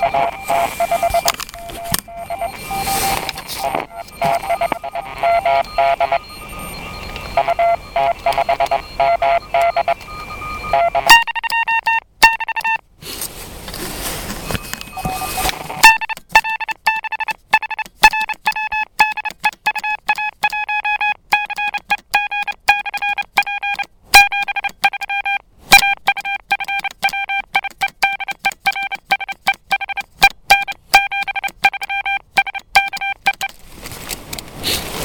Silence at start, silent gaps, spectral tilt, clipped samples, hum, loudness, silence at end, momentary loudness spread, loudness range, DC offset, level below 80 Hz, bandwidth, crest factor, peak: 0 s; none; -1.5 dB/octave; under 0.1%; none; -16 LUFS; 0 s; 14 LU; 5 LU; under 0.1%; -40 dBFS; 17.5 kHz; 18 dB; 0 dBFS